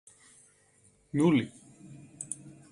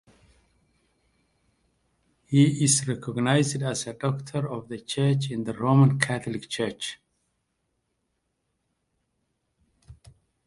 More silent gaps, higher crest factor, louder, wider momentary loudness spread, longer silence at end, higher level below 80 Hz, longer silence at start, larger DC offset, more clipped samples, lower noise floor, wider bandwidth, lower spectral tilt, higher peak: neither; second, 20 dB vs 26 dB; second, -30 LUFS vs -25 LUFS; first, 26 LU vs 12 LU; second, 0.25 s vs 0.55 s; second, -70 dBFS vs -62 dBFS; second, 1.15 s vs 2.3 s; neither; neither; second, -65 dBFS vs -77 dBFS; about the same, 11.5 kHz vs 11.5 kHz; about the same, -6 dB/octave vs -5 dB/octave; second, -14 dBFS vs -2 dBFS